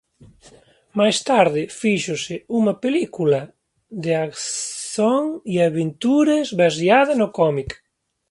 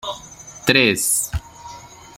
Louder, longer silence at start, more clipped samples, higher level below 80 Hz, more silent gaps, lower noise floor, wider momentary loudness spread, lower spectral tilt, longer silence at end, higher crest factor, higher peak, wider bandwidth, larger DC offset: second, -20 LUFS vs -17 LUFS; first, 0.95 s vs 0.05 s; neither; second, -54 dBFS vs -40 dBFS; neither; first, -51 dBFS vs -40 dBFS; second, 10 LU vs 24 LU; first, -4.5 dB/octave vs -2.5 dB/octave; first, 0.55 s vs 0.25 s; about the same, 20 dB vs 22 dB; about the same, 0 dBFS vs 0 dBFS; second, 11.5 kHz vs 16.5 kHz; neither